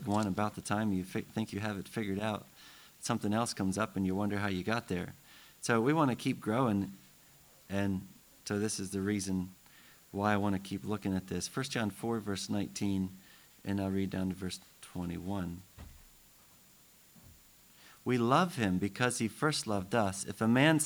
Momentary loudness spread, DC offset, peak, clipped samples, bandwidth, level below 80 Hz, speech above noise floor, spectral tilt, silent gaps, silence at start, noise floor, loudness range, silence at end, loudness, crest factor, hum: 13 LU; under 0.1%; -12 dBFS; under 0.1%; over 20 kHz; -66 dBFS; 28 dB; -5 dB/octave; none; 0 s; -61 dBFS; 6 LU; 0 s; -34 LUFS; 22 dB; none